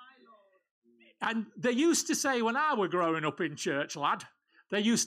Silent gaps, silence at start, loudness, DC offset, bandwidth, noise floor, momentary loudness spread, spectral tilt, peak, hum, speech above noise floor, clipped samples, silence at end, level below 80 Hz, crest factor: 0.71-0.82 s; 0 s; -30 LUFS; under 0.1%; 16 kHz; -62 dBFS; 8 LU; -3 dB/octave; -18 dBFS; none; 32 dB; under 0.1%; 0 s; -82 dBFS; 14 dB